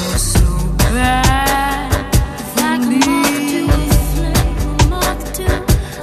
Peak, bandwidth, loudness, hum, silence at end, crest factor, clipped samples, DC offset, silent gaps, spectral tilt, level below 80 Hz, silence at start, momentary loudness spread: 0 dBFS; 14 kHz; -15 LUFS; none; 0 s; 14 dB; under 0.1%; under 0.1%; none; -4.5 dB/octave; -18 dBFS; 0 s; 5 LU